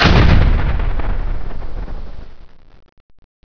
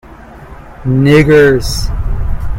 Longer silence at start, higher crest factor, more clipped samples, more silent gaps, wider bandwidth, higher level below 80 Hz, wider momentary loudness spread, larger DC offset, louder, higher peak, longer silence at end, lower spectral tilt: about the same, 0 s vs 0.1 s; about the same, 16 dB vs 12 dB; second, under 0.1% vs 0.2%; first, 2.92-3.09 s vs none; second, 5.4 kHz vs 16.5 kHz; about the same, -18 dBFS vs -20 dBFS; first, 22 LU vs 13 LU; neither; second, -17 LUFS vs -10 LUFS; about the same, 0 dBFS vs 0 dBFS; first, 0.35 s vs 0 s; about the same, -6.5 dB/octave vs -6.5 dB/octave